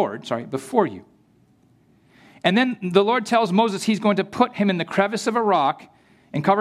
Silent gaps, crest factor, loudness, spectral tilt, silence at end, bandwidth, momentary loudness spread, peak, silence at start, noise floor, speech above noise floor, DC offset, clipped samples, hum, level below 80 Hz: none; 20 dB; -21 LUFS; -5.5 dB/octave; 0 s; 13.5 kHz; 9 LU; -2 dBFS; 0 s; -58 dBFS; 37 dB; under 0.1%; under 0.1%; none; -68 dBFS